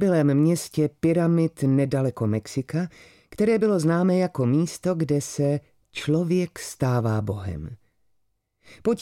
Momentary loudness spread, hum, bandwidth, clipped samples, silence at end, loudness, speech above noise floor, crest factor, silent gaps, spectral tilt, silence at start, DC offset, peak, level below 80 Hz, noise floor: 10 LU; none; 16 kHz; under 0.1%; 0 s; -24 LUFS; 49 dB; 14 dB; none; -7 dB/octave; 0 s; under 0.1%; -10 dBFS; -54 dBFS; -72 dBFS